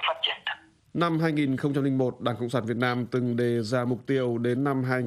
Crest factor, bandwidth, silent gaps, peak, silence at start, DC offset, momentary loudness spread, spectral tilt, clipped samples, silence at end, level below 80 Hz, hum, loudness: 16 dB; 13 kHz; none; -10 dBFS; 0 s; under 0.1%; 4 LU; -7 dB/octave; under 0.1%; 0 s; -68 dBFS; none; -27 LUFS